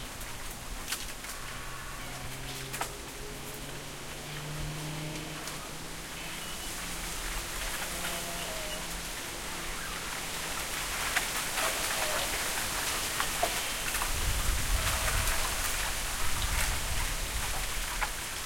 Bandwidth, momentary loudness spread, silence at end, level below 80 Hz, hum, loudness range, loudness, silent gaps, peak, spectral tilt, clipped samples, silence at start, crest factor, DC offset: 16.5 kHz; 11 LU; 0 s; -40 dBFS; none; 8 LU; -33 LUFS; none; -14 dBFS; -2 dB/octave; under 0.1%; 0 s; 20 dB; under 0.1%